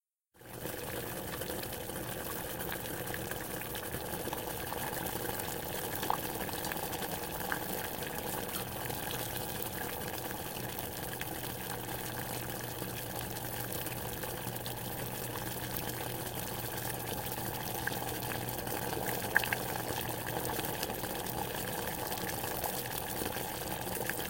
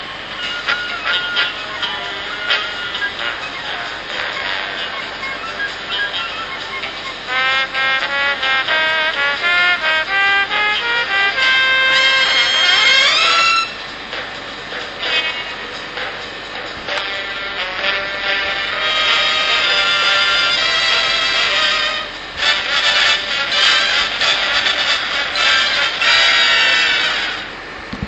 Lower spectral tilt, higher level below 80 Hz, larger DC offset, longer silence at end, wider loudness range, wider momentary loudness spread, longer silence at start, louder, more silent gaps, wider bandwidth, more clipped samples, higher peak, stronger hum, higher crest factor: first, -3.5 dB/octave vs -0.5 dB/octave; second, -56 dBFS vs -48 dBFS; neither; about the same, 0 s vs 0 s; second, 3 LU vs 9 LU; second, 3 LU vs 13 LU; first, 0.35 s vs 0 s; second, -37 LUFS vs -14 LUFS; neither; first, 17 kHz vs 9 kHz; neither; second, -8 dBFS vs 0 dBFS; neither; first, 30 dB vs 16 dB